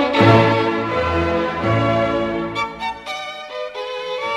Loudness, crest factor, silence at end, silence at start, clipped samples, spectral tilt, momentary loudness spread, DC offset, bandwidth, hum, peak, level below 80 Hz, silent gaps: -19 LUFS; 18 dB; 0 s; 0 s; under 0.1%; -6.5 dB/octave; 15 LU; under 0.1%; 10.5 kHz; none; 0 dBFS; -40 dBFS; none